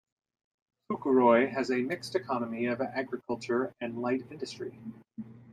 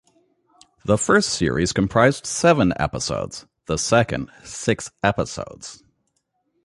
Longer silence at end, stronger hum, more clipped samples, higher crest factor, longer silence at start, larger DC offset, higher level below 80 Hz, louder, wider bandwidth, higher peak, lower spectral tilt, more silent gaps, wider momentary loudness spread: second, 0 s vs 0.9 s; neither; neither; about the same, 20 dB vs 20 dB; about the same, 0.9 s vs 0.85 s; neither; second, -74 dBFS vs -44 dBFS; second, -30 LUFS vs -20 LUFS; about the same, 12 kHz vs 11.5 kHz; second, -10 dBFS vs -2 dBFS; first, -6 dB/octave vs -4.5 dB/octave; neither; first, 20 LU vs 16 LU